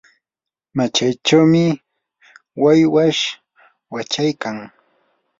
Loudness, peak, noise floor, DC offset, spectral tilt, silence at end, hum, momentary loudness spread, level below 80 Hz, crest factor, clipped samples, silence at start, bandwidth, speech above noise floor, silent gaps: -16 LUFS; -2 dBFS; -88 dBFS; under 0.1%; -5 dB/octave; 0.75 s; none; 18 LU; -60 dBFS; 18 dB; under 0.1%; 0.75 s; 7.8 kHz; 72 dB; none